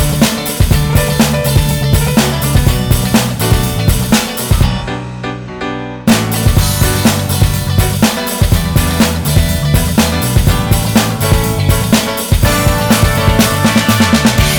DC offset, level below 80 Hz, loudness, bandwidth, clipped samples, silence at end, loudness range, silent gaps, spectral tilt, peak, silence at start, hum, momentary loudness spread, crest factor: 0.2%; -20 dBFS; -12 LUFS; over 20 kHz; under 0.1%; 0 s; 3 LU; none; -4.5 dB/octave; 0 dBFS; 0 s; none; 4 LU; 12 dB